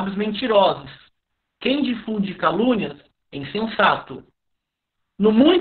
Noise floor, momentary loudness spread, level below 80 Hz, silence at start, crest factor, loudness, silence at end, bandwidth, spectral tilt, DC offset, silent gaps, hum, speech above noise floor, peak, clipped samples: -78 dBFS; 15 LU; -56 dBFS; 0 s; 20 dB; -20 LUFS; 0 s; 4.7 kHz; -3.5 dB/octave; under 0.1%; none; none; 59 dB; -2 dBFS; under 0.1%